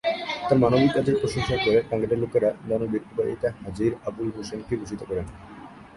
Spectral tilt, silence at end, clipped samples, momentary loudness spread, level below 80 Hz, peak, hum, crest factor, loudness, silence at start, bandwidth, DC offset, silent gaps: -6.5 dB/octave; 0 s; under 0.1%; 12 LU; -48 dBFS; -8 dBFS; none; 18 dB; -25 LUFS; 0.05 s; 11.5 kHz; under 0.1%; none